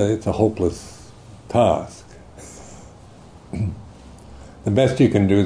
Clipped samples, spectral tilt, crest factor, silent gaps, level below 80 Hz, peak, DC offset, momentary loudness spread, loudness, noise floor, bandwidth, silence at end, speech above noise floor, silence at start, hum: under 0.1%; -7 dB/octave; 18 dB; none; -44 dBFS; -4 dBFS; under 0.1%; 26 LU; -20 LUFS; -44 dBFS; 11 kHz; 0 s; 26 dB; 0 s; none